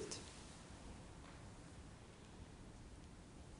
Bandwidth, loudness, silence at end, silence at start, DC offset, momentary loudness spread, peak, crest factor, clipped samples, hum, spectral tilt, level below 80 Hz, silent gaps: 11 kHz; -57 LUFS; 0 s; 0 s; under 0.1%; 6 LU; -28 dBFS; 28 dB; under 0.1%; none; -4 dB/octave; -62 dBFS; none